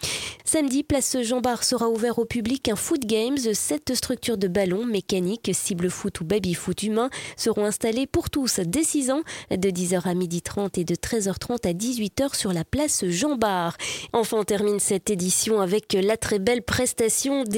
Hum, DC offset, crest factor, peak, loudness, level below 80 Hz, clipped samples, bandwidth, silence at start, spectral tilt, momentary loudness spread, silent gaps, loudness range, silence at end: none; under 0.1%; 20 dB; -6 dBFS; -24 LUFS; -50 dBFS; under 0.1%; 17 kHz; 0 s; -4 dB/octave; 5 LU; none; 2 LU; 0 s